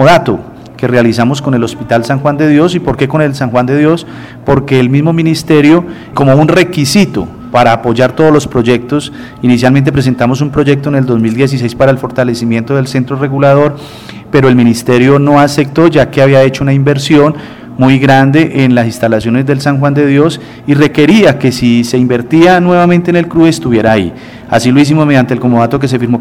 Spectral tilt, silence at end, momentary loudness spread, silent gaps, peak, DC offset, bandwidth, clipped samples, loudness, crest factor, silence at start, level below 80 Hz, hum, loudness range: -6.5 dB/octave; 0 s; 7 LU; none; 0 dBFS; 0.3%; 15.5 kHz; 1%; -9 LUFS; 8 dB; 0 s; -38 dBFS; none; 3 LU